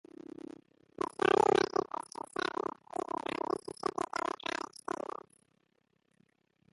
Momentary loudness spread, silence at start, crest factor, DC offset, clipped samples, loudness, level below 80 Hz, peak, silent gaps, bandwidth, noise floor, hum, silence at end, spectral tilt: 20 LU; 1 s; 24 dB; under 0.1%; under 0.1%; -35 LUFS; -72 dBFS; -12 dBFS; none; 11.5 kHz; -76 dBFS; none; 2.5 s; -4 dB/octave